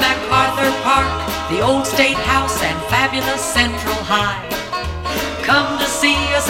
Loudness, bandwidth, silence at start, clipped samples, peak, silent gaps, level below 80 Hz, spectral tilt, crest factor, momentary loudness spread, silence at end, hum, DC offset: -16 LUFS; 16.5 kHz; 0 s; under 0.1%; 0 dBFS; none; -32 dBFS; -3 dB/octave; 16 dB; 7 LU; 0 s; none; under 0.1%